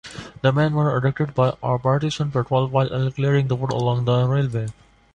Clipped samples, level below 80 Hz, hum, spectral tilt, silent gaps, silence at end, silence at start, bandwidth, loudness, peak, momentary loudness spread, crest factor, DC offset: under 0.1%; -50 dBFS; none; -7.5 dB/octave; none; 0.4 s; 0.05 s; 9 kHz; -21 LUFS; -6 dBFS; 4 LU; 16 dB; under 0.1%